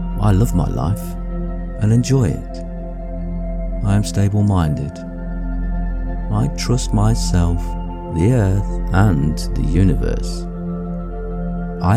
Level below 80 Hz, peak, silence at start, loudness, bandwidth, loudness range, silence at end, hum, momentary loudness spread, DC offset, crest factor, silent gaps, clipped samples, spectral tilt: -24 dBFS; -2 dBFS; 0 s; -20 LUFS; 14 kHz; 3 LU; 0 s; none; 12 LU; under 0.1%; 14 dB; none; under 0.1%; -7 dB/octave